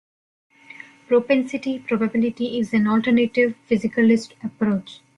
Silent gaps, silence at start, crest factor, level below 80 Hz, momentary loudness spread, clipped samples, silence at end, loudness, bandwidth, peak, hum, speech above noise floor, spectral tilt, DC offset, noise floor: none; 1.1 s; 14 dB; -62 dBFS; 9 LU; under 0.1%; 0.25 s; -21 LUFS; 10 kHz; -6 dBFS; none; 24 dB; -6.5 dB/octave; under 0.1%; -44 dBFS